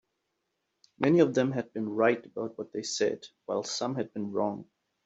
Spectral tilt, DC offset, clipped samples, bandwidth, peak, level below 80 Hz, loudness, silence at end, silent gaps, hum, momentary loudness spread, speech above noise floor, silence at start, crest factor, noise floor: -5 dB/octave; under 0.1%; under 0.1%; 8 kHz; -8 dBFS; -74 dBFS; -30 LUFS; 0.4 s; none; none; 13 LU; 52 dB; 1 s; 22 dB; -81 dBFS